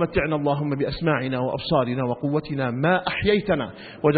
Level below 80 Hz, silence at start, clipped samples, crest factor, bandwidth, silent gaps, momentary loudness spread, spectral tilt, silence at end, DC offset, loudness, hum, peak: -46 dBFS; 0 s; under 0.1%; 18 dB; 4.8 kHz; none; 4 LU; -11.5 dB/octave; 0 s; under 0.1%; -23 LUFS; none; -6 dBFS